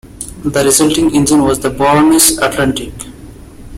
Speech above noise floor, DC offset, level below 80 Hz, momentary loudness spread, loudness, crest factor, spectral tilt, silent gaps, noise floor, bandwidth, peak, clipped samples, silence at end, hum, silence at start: 22 dB; under 0.1%; -34 dBFS; 19 LU; -11 LUFS; 12 dB; -3.5 dB/octave; none; -33 dBFS; 17 kHz; 0 dBFS; under 0.1%; 0 s; none; 0.05 s